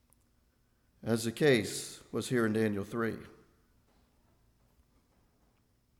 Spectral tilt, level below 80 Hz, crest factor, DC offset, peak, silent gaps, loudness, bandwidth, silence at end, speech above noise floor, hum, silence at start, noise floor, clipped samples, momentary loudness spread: -5 dB/octave; -70 dBFS; 22 dB; under 0.1%; -14 dBFS; none; -32 LUFS; 17.5 kHz; 2.7 s; 40 dB; none; 1.05 s; -71 dBFS; under 0.1%; 12 LU